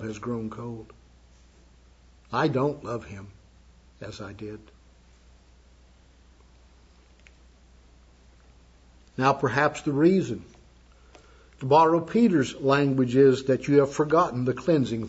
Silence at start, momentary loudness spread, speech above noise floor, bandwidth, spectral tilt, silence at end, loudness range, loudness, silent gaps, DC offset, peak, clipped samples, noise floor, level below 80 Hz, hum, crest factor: 0 s; 20 LU; 32 dB; 8 kHz; -7 dB/octave; 0 s; 23 LU; -23 LUFS; none; under 0.1%; -8 dBFS; under 0.1%; -55 dBFS; -56 dBFS; none; 20 dB